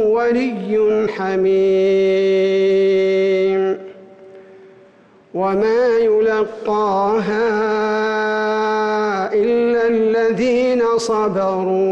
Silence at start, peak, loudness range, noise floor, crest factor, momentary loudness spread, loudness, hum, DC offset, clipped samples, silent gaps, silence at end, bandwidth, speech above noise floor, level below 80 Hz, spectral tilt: 0 s; -8 dBFS; 3 LU; -48 dBFS; 8 dB; 5 LU; -17 LUFS; none; under 0.1%; under 0.1%; none; 0 s; 8.8 kHz; 33 dB; -56 dBFS; -6 dB/octave